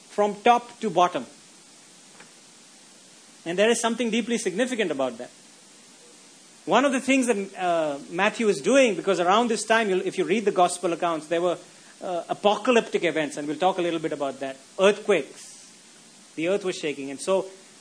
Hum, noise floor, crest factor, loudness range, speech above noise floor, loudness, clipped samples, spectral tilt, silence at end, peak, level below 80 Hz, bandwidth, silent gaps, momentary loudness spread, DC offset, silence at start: none; -51 dBFS; 20 dB; 5 LU; 27 dB; -24 LUFS; under 0.1%; -3.5 dB/octave; 0.25 s; -4 dBFS; -78 dBFS; 11 kHz; none; 13 LU; under 0.1%; 0.1 s